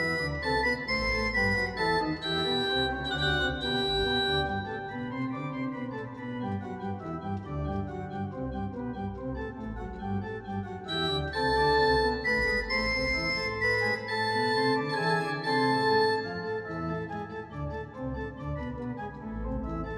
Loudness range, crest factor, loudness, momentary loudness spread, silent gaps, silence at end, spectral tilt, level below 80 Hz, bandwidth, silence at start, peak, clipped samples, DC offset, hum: 9 LU; 16 dB; -29 LUFS; 11 LU; none; 0 s; -5.5 dB/octave; -44 dBFS; 13.5 kHz; 0 s; -14 dBFS; under 0.1%; under 0.1%; none